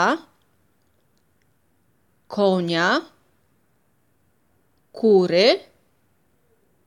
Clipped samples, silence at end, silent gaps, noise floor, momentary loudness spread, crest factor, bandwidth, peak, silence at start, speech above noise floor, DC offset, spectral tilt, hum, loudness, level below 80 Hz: under 0.1%; 1.25 s; none; -66 dBFS; 9 LU; 20 dB; 11 kHz; -4 dBFS; 0 s; 48 dB; under 0.1%; -5 dB/octave; none; -20 LUFS; -74 dBFS